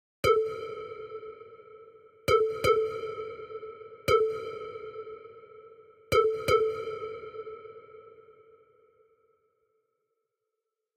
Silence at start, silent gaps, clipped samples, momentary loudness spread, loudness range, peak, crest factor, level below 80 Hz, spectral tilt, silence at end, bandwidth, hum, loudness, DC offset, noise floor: 0.25 s; none; under 0.1%; 23 LU; 12 LU; -12 dBFS; 20 dB; -58 dBFS; -4.5 dB/octave; 2.65 s; 15.5 kHz; none; -29 LUFS; under 0.1%; -86 dBFS